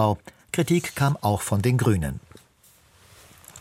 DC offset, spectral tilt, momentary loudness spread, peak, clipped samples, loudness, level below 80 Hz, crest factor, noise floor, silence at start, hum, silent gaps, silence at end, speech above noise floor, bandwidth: under 0.1%; -6 dB/octave; 11 LU; -6 dBFS; under 0.1%; -24 LUFS; -46 dBFS; 18 dB; -58 dBFS; 0 s; none; none; 0 s; 35 dB; 16.5 kHz